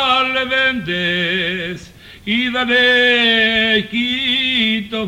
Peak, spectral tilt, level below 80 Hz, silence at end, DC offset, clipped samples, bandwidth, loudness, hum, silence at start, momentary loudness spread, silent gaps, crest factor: -4 dBFS; -4.5 dB/octave; -48 dBFS; 0 s; under 0.1%; under 0.1%; 16 kHz; -14 LUFS; none; 0 s; 9 LU; none; 14 dB